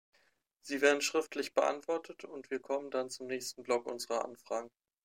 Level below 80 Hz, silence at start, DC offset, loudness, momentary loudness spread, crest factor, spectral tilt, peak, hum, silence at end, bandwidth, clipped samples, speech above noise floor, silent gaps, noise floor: -86 dBFS; 0.65 s; under 0.1%; -35 LUFS; 12 LU; 24 dB; -2 dB/octave; -12 dBFS; none; 0.35 s; 16 kHz; under 0.1%; 39 dB; none; -74 dBFS